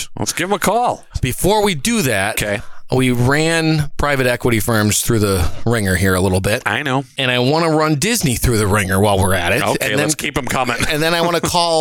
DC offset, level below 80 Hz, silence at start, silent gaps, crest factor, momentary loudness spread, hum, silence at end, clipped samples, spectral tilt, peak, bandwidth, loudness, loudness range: under 0.1%; -32 dBFS; 0 s; none; 12 dB; 4 LU; none; 0 s; under 0.1%; -4.5 dB/octave; -2 dBFS; 18 kHz; -16 LUFS; 1 LU